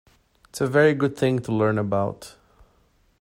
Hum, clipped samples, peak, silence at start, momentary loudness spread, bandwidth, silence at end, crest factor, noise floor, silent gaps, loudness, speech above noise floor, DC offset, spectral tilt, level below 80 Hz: none; under 0.1%; -6 dBFS; 0.55 s; 21 LU; 16 kHz; 0.9 s; 18 dB; -62 dBFS; none; -22 LUFS; 40 dB; under 0.1%; -6.5 dB/octave; -58 dBFS